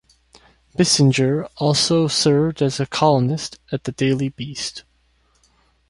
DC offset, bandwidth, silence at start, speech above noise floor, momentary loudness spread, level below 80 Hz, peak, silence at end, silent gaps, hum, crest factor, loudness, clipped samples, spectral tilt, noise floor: under 0.1%; 11.5 kHz; 0.8 s; 42 dB; 13 LU; -52 dBFS; -2 dBFS; 1.1 s; none; none; 18 dB; -19 LUFS; under 0.1%; -5 dB/octave; -61 dBFS